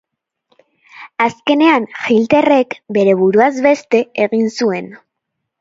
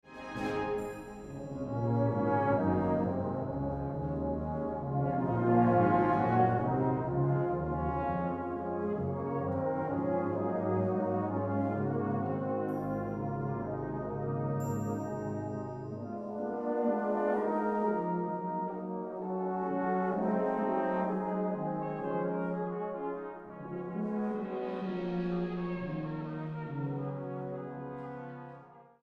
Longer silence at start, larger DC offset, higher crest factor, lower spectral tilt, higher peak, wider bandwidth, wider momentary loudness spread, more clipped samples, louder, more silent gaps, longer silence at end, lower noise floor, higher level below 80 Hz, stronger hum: first, 0.95 s vs 0.05 s; neither; second, 14 dB vs 20 dB; second, -5.5 dB/octave vs -9.5 dB/octave; first, 0 dBFS vs -14 dBFS; second, 7.8 kHz vs 12.5 kHz; second, 7 LU vs 11 LU; neither; first, -14 LUFS vs -33 LUFS; neither; first, 0.65 s vs 0.2 s; first, -76 dBFS vs -54 dBFS; about the same, -60 dBFS vs -56 dBFS; neither